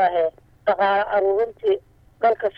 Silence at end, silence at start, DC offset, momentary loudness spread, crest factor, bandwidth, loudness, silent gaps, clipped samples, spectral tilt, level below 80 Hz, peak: 0.1 s; 0 s; under 0.1%; 7 LU; 14 dB; 5.2 kHz; -22 LUFS; none; under 0.1%; -6.5 dB/octave; -56 dBFS; -6 dBFS